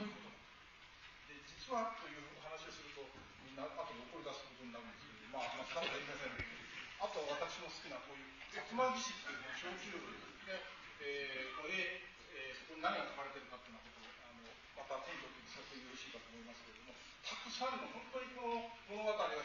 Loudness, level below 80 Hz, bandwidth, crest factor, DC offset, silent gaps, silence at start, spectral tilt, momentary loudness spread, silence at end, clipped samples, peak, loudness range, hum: -46 LUFS; -72 dBFS; 7.2 kHz; 22 dB; under 0.1%; none; 0 s; -1 dB/octave; 15 LU; 0 s; under 0.1%; -24 dBFS; 7 LU; none